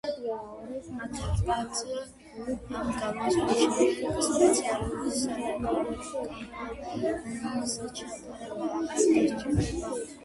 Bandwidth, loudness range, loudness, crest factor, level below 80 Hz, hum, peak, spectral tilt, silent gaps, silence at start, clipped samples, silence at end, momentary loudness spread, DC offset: 11.5 kHz; 6 LU; -29 LUFS; 20 dB; -46 dBFS; none; -10 dBFS; -4.5 dB/octave; none; 0.05 s; under 0.1%; 0 s; 15 LU; under 0.1%